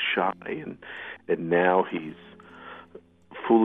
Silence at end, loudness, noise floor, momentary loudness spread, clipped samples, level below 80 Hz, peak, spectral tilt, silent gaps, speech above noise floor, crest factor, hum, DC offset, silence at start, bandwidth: 0 s; -27 LUFS; -51 dBFS; 24 LU; under 0.1%; -72 dBFS; -8 dBFS; -8 dB/octave; none; 25 dB; 20 dB; none; under 0.1%; 0 s; 3.9 kHz